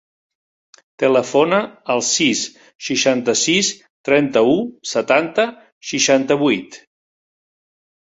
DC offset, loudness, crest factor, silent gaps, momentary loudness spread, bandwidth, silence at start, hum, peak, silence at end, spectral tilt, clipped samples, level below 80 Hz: under 0.1%; -17 LUFS; 18 dB; 2.75-2.79 s, 3.90-4.04 s, 5.72-5.81 s; 8 LU; 8 kHz; 1 s; none; -2 dBFS; 1.3 s; -3 dB/octave; under 0.1%; -62 dBFS